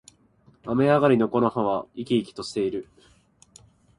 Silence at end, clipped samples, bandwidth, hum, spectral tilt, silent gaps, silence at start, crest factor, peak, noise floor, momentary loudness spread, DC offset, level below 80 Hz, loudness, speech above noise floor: 1.15 s; under 0.1%; 11 kHz; none; -7 dB/octave; none; 0.65 s; 20 dB; -4 dBFS; -59 dBFS; 12 LU; under 0.1%; -60 dBFS; -24 LUFS; 36 dB